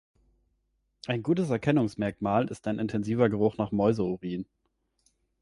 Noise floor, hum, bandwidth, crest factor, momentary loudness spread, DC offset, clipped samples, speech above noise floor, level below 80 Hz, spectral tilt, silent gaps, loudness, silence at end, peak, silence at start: -76 dBFS; none; 11.5 kHz; 18 dB; 9 LU; under 0.1%; under 0.1%; 49 dB; -58 dBFS; -8 dB/octave; none; -28 LUFS; 1 s; -10 dBFS; 1.05 s